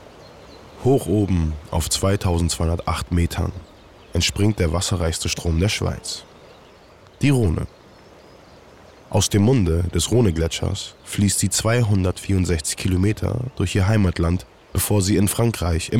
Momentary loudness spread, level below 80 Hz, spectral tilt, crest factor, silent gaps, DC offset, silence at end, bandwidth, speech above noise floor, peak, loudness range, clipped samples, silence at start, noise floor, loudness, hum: 8 LU; -38 dBFS; -5 dB/octave; 12 dB; none; 0.4%; 0 s; 16.5 kHz; 28 dB; -8 dBFS; 4 LU; under 0.1%; 0 s; -48 dBFS; -21 LUFS; none